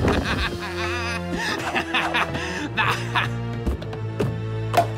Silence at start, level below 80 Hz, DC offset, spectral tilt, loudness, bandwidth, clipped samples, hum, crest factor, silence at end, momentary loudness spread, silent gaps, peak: 0 s; -36 dBFS; under 0.1%; -5 dB/octave; -24 LUFS; 16 kHz; under 0.1%; none; 16 dB; 0 s; 6 LU; none; -8 dBFS